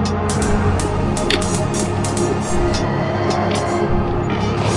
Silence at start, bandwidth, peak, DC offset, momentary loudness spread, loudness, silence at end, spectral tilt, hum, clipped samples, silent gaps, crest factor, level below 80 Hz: 0 s; 11.5 kHz; -4 dBFS; under 0.1%; 2 LU; -19 LUFS; 0 s; -5.5 dB/octave; none; under 0.1%; none; 14 dB; -28 dBFS